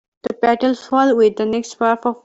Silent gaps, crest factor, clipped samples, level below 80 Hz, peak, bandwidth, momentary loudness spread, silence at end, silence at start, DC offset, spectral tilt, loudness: none; 14 dB; under 0.1%; -60 dBFS; -4 dBFS; 8 kHz; 7 LU; 0.1 s; 0.25 s; under 0.1%; -5 dB/octave; -17 LUFS